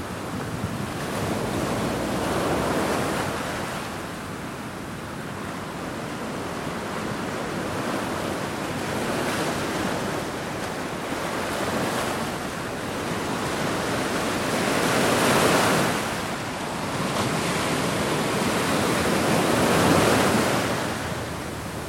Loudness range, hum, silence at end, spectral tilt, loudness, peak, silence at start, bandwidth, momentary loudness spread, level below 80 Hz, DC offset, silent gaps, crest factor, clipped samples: 9 LU; none; 0 s; -4 dB/octave; -25 LUFS; -6 dBFS; 0 s; 16.5 kHz; 12 LU; -48 dBFS; under 0.1%; none; 20 dB; under 0.1%